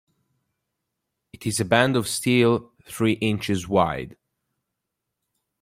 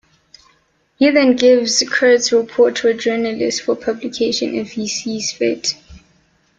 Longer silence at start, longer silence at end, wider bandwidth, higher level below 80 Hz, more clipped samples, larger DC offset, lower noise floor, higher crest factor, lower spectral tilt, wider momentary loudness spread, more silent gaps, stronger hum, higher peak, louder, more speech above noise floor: first, 1.4 s vs 1 s; first, 1.5 s vs 0.6 s; first, 16 kHz vs 9.2 kHz; about the same, -56 dBFS vs -56 dBFS; neither; neither; first, -82 dBFS vs -59 dBFS; first, 22 dB vs 16 dB; first, -5 dB/octave vs -2.5 dB/octave; first, 13 LU vs 10 LU; neither; neither; about the same, -2 dBFS vs 0 dBFS; second, -22 LUFS vs -16 LUFS; first, 60 dB vs 43 dB